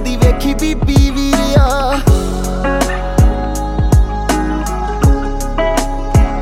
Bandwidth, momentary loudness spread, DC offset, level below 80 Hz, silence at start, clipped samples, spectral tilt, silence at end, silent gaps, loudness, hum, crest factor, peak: 16 kHz; 6 LU; under 0.1%; -16 dBFS; 0 s; under 0.1%; -6 dB/octave; 0 s; none; -14 LUFS; none; 12 dB; 0 dBFS